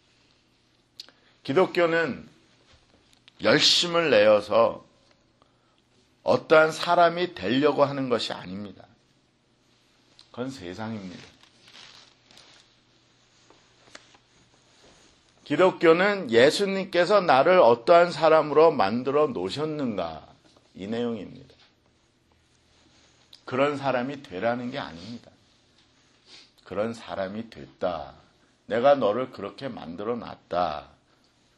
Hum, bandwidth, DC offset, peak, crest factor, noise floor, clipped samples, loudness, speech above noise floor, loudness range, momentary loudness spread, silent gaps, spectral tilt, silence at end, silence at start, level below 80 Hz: none; 12 kHz; under 0.1%; -4 dBFS; 22 dB; -65 dBFS; under 0.1%; -23 LUFS; 42 dB; 18 LU; 20 LU; none; -4.5 dB/octave; 0.75 s; 1.45 s; -66 dBFS